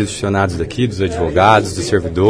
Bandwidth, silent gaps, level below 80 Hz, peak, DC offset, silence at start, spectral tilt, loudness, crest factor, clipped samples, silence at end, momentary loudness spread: 11 kHz; none; -34 dBFS; 0 dBFS; under 0.1%; 0 s; -5.5 dB/octave; -15 LUFS; 14 dB; under 0.1%; 0 s; 8 LU